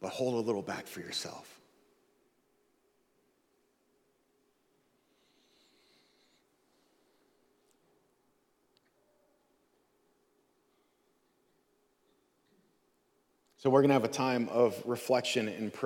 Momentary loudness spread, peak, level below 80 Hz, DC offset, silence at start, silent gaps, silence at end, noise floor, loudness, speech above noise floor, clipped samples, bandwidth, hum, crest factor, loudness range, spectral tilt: 13 LU; -12 dBFS; -84 dBFS; under 0.1%; 0 s; none; 0 s; -74 dBFS; -31 LUFS; 43 dB; under 0.1%; 18 kHz; none; 26 dB; 15 LU; -5 dB/octave